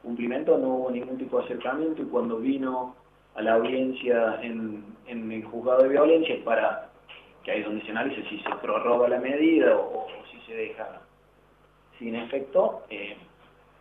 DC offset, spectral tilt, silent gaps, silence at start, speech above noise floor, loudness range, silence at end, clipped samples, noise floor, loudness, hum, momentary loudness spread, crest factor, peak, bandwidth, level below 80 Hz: under 0.1%; -8 dB/octave; none; 0.05 s; 34 dB; 6 LU; 0.55 s; under 0.1%; -59 dBFS; -26 LUFS; 50 Hz at -65 dBFS; 18 LU; 18 dB; -8 dBFS; 3.9 kHz; -66 dBFS